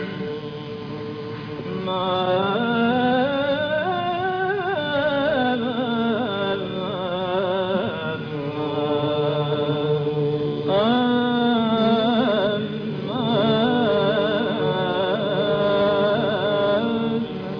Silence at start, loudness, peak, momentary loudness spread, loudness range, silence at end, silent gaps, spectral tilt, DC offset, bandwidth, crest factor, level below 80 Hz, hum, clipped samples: 0 s; -22 LUFS; -10 dBFS; 9 LU; 4 LU; 0 s; none; -8.5 dB/octave; under 0.1%; 5.4 kHz; 12 dB; -56 dBFS; none; under 0.1%